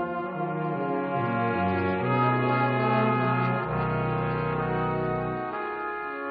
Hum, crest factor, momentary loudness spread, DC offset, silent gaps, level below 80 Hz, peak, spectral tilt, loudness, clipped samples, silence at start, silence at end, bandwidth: none; 16 dB; 7 LU; under 0.1%; none; -52 dBFS; -12 dBFS; -6 dB/octave; -27 LUFS; under 0.1%; 0 s; 0 s; 5 kHz